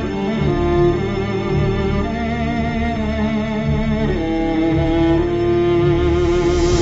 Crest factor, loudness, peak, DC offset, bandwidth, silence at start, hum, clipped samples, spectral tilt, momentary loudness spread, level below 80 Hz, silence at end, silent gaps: 14 dB; -18 LUFS; -4 dBFS; under 0.1%; 8 kHz; 0 s; none; under 0.1%; -7 dB/octave; 5 LU; -26 dBFS; 0 s; none